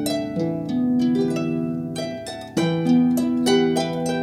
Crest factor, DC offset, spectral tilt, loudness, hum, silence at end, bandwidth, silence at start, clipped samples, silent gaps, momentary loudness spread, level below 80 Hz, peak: 14 dB; under 0.1%; -6 dB/octave; -22 LUFS; none; 0 s; 14.5 kHz; 0 s; under 0.1%; none; 9 LU; -56 dBFS; -8 dBFS